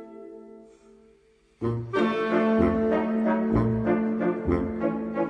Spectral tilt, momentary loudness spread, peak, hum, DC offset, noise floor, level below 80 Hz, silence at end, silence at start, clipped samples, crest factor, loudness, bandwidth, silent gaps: -9 dB/octave; 12 LU; -8 dBFS; none; under 0.1%; -60 dBFS; -44 dBFS; 0 s; 0 s; under 0.1%; 18 dB; -25 LUFS; 6 kHz; none